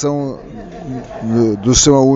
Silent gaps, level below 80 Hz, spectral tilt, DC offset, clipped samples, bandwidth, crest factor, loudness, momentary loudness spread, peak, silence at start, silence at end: none; -32 dBFS; -4.5 dB/octave; under 0.1%; under 0.1%; 8 kHz; 14 dB; -14 LUFS; 21 LU; 0 dBFS; 0 s; 0 s